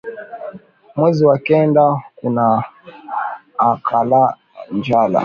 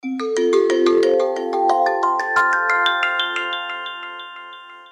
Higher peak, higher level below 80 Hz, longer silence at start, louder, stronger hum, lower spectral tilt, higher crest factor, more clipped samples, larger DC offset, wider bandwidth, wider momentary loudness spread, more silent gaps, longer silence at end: about the same, -2 dBFS vs -4 dBFS; first, -58 dBFS vs -68 dBFS; about the same, 0.05 s vs 0.05 s; about the same, -16 LUFS vs -18 LUFS; neither; first, -9 dB/octave vs -2 dB/octave; about the same, 16 dB vs 14 dB; neither; neither; second, 7 kHz vs 10.5 kHz; about the same, 18 LU vs 16 LU; neither; about the same, 0 s vs 0.05 s